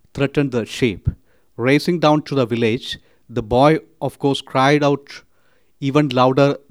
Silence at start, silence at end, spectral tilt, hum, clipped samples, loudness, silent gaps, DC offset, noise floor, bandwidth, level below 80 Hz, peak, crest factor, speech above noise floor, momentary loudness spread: 0.15 s; 0.15 s; -6.5 dB/octave; none; under 0.1%; -18 LUFS; none; 0.2%; -61 dBFS; 14.5 kHz; -44 dBFS; 0 dBFS; 18 dB; 44 dB; 13 LU